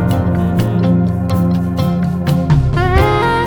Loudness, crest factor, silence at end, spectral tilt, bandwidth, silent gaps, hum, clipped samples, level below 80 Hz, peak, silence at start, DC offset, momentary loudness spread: -14 LUFS; 12 dB; 0 s; -8 dB/octave; 19 kHz; none; none; under 0.1%; -24 dBFS; 0 dBFS; 0 s; under 0.1%; 3 LU